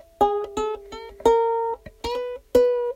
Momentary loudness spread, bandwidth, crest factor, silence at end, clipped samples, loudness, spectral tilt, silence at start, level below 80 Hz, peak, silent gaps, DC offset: 11 LU; 16 kHz; 18 dB; 0 s; under 0.1%; -23 LUFS; -4.5 dB/octave; 0.2 s; -48 dBFS; -6 dBFS; none; under 0.1%